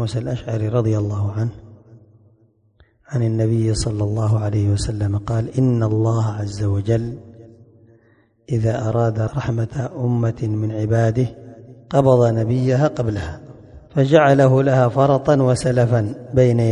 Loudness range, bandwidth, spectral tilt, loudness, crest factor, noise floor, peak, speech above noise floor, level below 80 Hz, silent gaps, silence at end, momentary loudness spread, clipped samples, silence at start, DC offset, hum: 7 LU; 10.5 kHz; -7.5 dB/octave; -19 LUFS; 18 dB; -57 dBFS; 0 dBFS; 39 dB; -40 dBFS; none; 0 s; 10 LU; under 0.1%; 0 s; under 0.1%; none